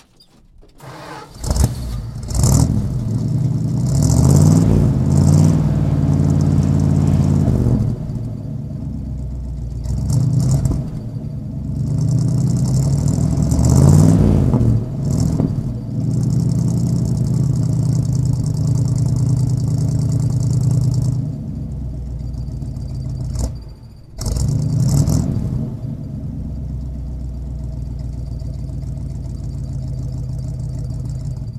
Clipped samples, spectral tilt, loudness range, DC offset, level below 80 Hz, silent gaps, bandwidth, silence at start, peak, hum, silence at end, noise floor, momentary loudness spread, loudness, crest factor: under 0.1%; -7.5 dB/octave; 12 LU; under 0.1%; -28 dBFS; none; 14.5 kHz; 0.6 s; 0 dBFS; none; 0 s; -49 dBFS; 14 LU; -18 LUFS; 16 dB